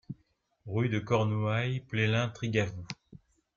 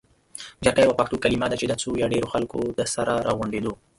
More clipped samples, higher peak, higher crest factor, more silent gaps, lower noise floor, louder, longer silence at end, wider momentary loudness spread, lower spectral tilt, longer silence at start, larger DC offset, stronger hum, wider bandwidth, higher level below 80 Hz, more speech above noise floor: neither; second, -14 dBFS vs -2 dBFS; about the same, 18 dB vs 22 dB; neither; first, -72 dBFS vs -43 dBFS; second, -31 LUFS vs -24 LUFS; first, 0.4 s vs 0.25 s; first, 16 LU vs 9 LU; first, -6.5 dB/octave vs -4.5 dB/octave; second, 0.1 s vs 0.35 s; neither; neither; second, 7.2 kHz vs 11.5 kHz; second, -62 dBFS vs -48 dBFS; first, 42 dB vs 20 dB